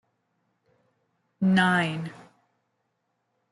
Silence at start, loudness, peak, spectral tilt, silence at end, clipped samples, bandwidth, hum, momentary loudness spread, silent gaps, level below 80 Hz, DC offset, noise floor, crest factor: 1.4 s; -24 LUFS; -8 dBFS; -6 dB/octave; 1.35 s; under 0.1%; 11.5 kHz; none; 15 LU; none; -70 dBFS; under 0.1%; -77 dBFS; 20 dB